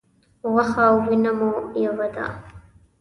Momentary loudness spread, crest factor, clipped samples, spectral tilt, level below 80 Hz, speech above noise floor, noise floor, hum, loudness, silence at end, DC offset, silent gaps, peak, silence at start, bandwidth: 14 LU; 18 dB; under 0.1%; -7.5 dB/octave; -54 dBFS; 27 dB; -47 dBFS; none; -21 LUFS; 0.4 s; under 0.1%; none; -4 dBFS; 0.45 s; 10.5 kHz